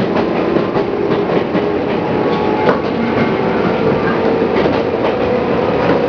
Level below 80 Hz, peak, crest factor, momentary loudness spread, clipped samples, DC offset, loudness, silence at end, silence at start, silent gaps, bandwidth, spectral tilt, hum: -40 dBFS; 0 dBFS; 14 dB; 2 LU; under 0.1%; under 0.1%; -15 LUFS; 0 s; 0 s; none; 5.4 kHz; -8 dB/octave; none